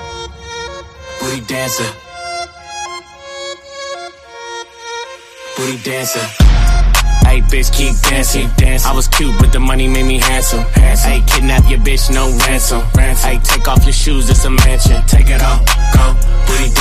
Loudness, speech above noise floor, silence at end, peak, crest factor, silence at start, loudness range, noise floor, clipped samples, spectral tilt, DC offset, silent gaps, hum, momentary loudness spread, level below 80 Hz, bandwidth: -13 LUFS; 22 dB; 0 s; 0 dBFS; 10 dB; 0 s; 12 LU; -31 dBFS; under 0.1%; -4 dB/octave; under 0.1%; none; none; 16 LU; -12 dBFS; 15.5 kHz